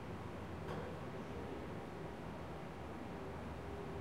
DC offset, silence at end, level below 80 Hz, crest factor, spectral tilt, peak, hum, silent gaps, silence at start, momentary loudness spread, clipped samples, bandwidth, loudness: 0.1%; 0 s; -60 dBFS; 14 dB; -7 dB/octave; -34 dBFS; none; none; 0 s; 3 LU; under 0.1%; 16 kHz; -48 LUFS